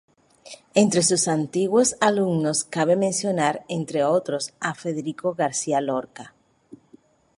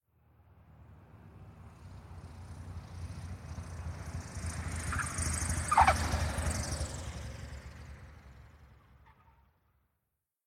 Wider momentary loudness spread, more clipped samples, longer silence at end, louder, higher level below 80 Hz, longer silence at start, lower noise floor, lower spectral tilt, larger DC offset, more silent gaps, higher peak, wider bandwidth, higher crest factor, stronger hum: second, 10 LU vs 25 LU; neither; second, 0.65 s vs 1.5 s; first, -22 LUFS vs -34 LUFS; second, -66 dBFS vs -44 dBFS; about the same, 0.45 s vs 0.55 s; second, -55 dBFS vs -85 dBFS; about the same, -4 dB/octave vs -4 dB/octave; neither; neither; first, -4 dBFS vs -12 dBFS; second, 11.5 kHz vs 15.5 kHz; second, 20 dB vs 26 dB; neither